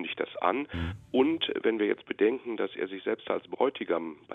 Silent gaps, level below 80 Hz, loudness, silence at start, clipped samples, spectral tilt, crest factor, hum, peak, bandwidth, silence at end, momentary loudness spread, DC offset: none; -54 dBFS; -30 LUFS; 0 s; under 0.1%; -7.5 dB/octave; 20 dB; none; -10 dBFS; 4.2 kHz; 0 s; 7 LU; under 0.1%